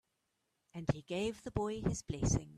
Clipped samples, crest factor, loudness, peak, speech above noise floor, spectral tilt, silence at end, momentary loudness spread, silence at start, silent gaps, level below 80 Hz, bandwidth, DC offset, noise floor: under 0.1%; 20 dB; -38 LUFS; -18 dBFS; 46 dB; -5.5 dB/octave; 0 s; 5 LU; 0.75 s; none; -50 dBFS; 13 kHz; under 0.1%; -83 dBFS